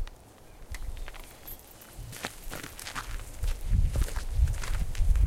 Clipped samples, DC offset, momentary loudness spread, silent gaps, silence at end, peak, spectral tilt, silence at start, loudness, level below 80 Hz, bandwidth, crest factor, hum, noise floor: under 0.1%; under 0.1%; 15 LU; none; 0 s; -12 dBFS; -4.5 dB/octave; 0 s; -35 LUFS; -30 dBFS; 16.5 kHz; 18 dB; none; -51 dBFS